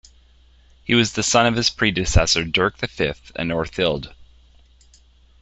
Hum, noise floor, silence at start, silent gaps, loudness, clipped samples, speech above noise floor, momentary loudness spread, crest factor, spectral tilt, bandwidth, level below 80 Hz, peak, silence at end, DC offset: none; -52 dBFS; 0.85 s; none; -20 LUFS; under 0.1%; 33 dB; 10 LU; 20 dB; -3.5 dB/octave; 8.4 kHz; -34 dBFS; -2 dBFS; 1.2 s; under 0.1%